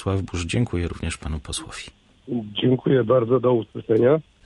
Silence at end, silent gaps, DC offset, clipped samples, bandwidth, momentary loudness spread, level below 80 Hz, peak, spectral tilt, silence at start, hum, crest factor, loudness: 0.25 s; none; under 0.1%; under 0.1%; 11.5 kHz; 12 LU; -38 dBFS; -6 dBFS; -6.5 dB/octave; 0 s; none; 16 dB; -22 LUFS